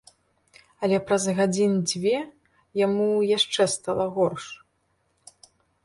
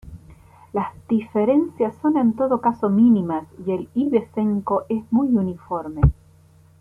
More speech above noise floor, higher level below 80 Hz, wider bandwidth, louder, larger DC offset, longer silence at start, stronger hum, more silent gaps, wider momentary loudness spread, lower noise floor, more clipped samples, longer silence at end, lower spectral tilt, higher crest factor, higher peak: first, 47 dB vs 32 dB; second, -64 dBFS vs -36 dBFS; first, 11.5 kHz vs 3.4 kHz; second, -24 LUFS vs -21 LUFS; neither; first, 0.8 s vs 0.05 s; neither; neither; about the same, 12 LU vs 10 LU; first, -70 dBFS vs -52 dBFS; neither; first, 1.3 s vs 0.7 s; second, -4.5 dB/octave vs -10.5 dB/octave; about the same, 18 dB vs 18 dB; second, -8 dBFS vs -2 dBFS